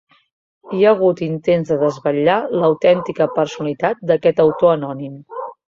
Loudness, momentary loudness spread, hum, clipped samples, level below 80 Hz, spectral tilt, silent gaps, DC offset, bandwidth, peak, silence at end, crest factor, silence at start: -17 LUFS; 13 LU; none; under 0.1%; -58 dBFS; -7 dB/octave; none; under 0.1%; 7.4 kHz; -2 dBFS; 0.15 s; 16 dB; 0.65 s